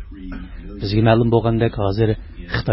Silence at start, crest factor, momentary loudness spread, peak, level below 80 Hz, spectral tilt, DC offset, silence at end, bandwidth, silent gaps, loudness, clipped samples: 0 s; 18 dB; 19 LU; 0 dBFS; -34 dBFS; -12 dB/octave; under 0.1%; 0 s; 5.8 kHz; none; -19 LUFS; under 0.1%